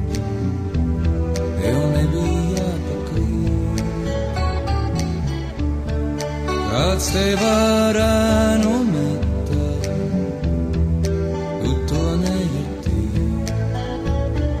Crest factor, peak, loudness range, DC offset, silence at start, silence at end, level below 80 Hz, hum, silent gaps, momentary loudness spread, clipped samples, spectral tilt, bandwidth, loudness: 14 dB; -4 dBFS; 5 LU; under 0.1%; 0 s; 0 s; -26 dBFS; none; none; 7 LU; under 0.1%; -6 dB/octave; 14 kHz; -21 LUFS